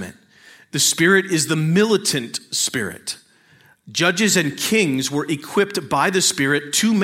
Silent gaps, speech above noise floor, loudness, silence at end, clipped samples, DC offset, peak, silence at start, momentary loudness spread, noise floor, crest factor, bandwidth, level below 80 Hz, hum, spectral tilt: none; 35 dB; -18 LUFS; 0 s; under 0.1%; under 0.1%; -2 dBFS; 0 s; 11 LU; -53 dBFS; 18 dB; 16.5 kHz; -64 dBFS; none; -3 dB/octave